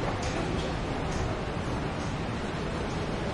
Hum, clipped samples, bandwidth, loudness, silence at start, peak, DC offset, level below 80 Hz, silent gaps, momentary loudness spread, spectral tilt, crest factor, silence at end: none; under 0.1%; 11.5 kHz; -32 LUFS; 0 s; -18 dBFS; under 0.1%; -40 dBFS; none; 2 LU; -5.5 dB/octave; 12 dB; 0 s